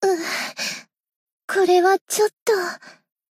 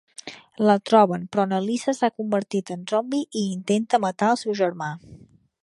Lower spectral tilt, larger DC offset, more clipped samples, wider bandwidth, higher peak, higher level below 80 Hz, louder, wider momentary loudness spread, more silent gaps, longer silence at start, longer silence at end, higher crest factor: second, -2 dB/octave vs -5.5 dB/octave; neither; neither; first, 16 kHz vs 11.5 kHz; about the same, -6 dBFS vs -4 dBFS; second, -80 dBFS vs -68 dBFS; about the same, -21 LUFS vs -23 LUFS; first, 17 LU vs 14 LU; first, 1.16-1.27 s, 1.33-1.38 s, 1.44-1.48 s, 2.01-2.06 s, 2.41-2.46 s vs none; second, 0 s vs 0.25 s; about the same, 0.4 s vs 0.45 s; about the same, 16 dB vs 20 dB